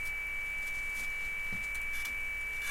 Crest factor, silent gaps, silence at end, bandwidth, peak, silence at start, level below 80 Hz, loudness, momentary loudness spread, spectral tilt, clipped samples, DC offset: 12 dB; none; 0 s; 16.5 kHz; -24 dBFS; 0 s; -48 dBFS; -35 LUFS; 0 LU; -1.5 dB/octave; under 0.1%; under 0.1%